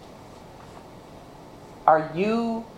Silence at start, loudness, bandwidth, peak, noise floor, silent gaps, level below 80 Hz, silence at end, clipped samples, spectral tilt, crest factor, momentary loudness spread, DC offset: 0 s; -23 LUFS; 14 kHz; -2 dBFS; -45 dBFS; none; -56 dBFS; 0 s; under 0.1%; -7 dB/octave; 26 dB; 24 LU; under 0.1%